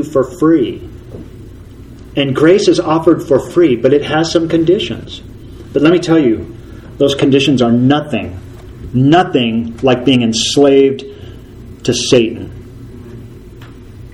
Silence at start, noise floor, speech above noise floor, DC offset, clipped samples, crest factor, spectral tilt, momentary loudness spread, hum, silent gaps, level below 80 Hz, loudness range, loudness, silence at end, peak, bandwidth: 0 s; -33 dBFS; 22 dB; under 0.1%; under 0.1%; 14 dB; -5.5 dB/octave; 23 LU; none; none; -38 dBFS; 2 LU; -12 LUFS; 0.05 s; 0 dBFS; 12 kHz